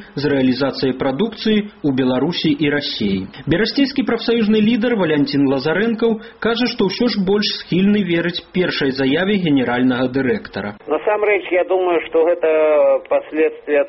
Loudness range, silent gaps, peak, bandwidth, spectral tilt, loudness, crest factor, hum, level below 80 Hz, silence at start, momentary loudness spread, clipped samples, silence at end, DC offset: 1 LU; none; -2 dBFS; 6 kHz; -4.5 dB/octave; -17 LUFS; 14 dB; none; -48 dBFS; 0 s; 5 LU; under 0.1%; 0 s; under 0.1%